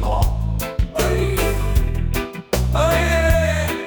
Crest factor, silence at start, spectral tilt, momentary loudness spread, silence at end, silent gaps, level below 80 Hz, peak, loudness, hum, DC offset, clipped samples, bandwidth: 14 dB; 0 s; -5.5 dB/octave; 7 LU; 0 s; none; -22 dBFS; -4 dBFS; -20 LUFS; none; under 0.1%; under 0.1%; 19.5 kHz